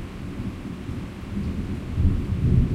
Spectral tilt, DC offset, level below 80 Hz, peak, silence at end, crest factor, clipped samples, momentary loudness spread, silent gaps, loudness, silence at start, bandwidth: -8.5 dB/octave; under 0.1%; -30 dBFS; -8 dBFS; 0 s; 18 dB; under 0.1%; 12 LU; none; -28 LUFS; 0 s; 11 kHz